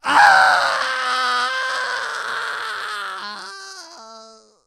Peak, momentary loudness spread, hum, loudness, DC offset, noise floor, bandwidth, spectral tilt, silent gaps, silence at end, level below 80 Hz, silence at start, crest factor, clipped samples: 0 dBFS; 23 LU; none; -18 LUFS; under 0.1%; -45 dBFS; 15 kHz; 0 dB/octave; none; 0.35 s; -66 dBFS; 0.05 s; 20 dB; under 0.1%